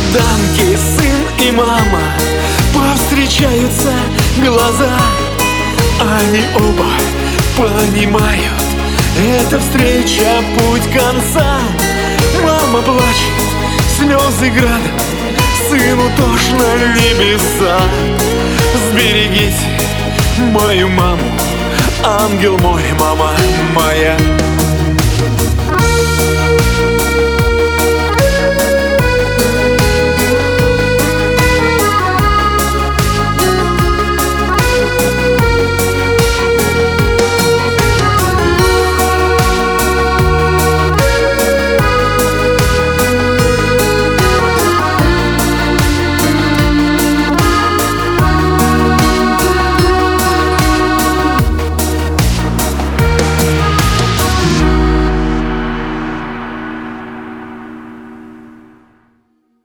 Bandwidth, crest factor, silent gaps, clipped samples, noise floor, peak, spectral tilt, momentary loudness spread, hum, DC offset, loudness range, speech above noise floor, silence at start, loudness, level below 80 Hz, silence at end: 19.5 kHz; 12 dB; none; under 0.1%; -57 dBFS; 0 dBFS; -4.5 dB/octave; 3 LU; none; under 0.1%; 2 LU; 47 dB; 0 s; -11 LUFS; -20 dBFS; 1.1 s